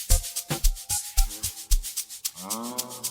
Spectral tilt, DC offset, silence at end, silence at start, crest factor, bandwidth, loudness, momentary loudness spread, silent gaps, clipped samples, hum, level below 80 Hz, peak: -2.5 dB/octave; under 0.1%; 0 s; 0 s; 22 dB; over 20 kHz; -29 LUFS; 6 LU; none; under 0.1%; none; -28 dBFS; -6 dBFS